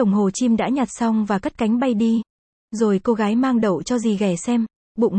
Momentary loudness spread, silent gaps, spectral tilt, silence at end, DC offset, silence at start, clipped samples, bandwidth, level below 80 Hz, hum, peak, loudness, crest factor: 4 LU; 2.30-2.68 s, 4.76-4.95 s; -6 dB/octave; 0 s; under 0.1%; 0 s; under 0.1%; 8.8 kHz; -54 dBFS; none; -8 dBFS; -20 LUFS; 12 dB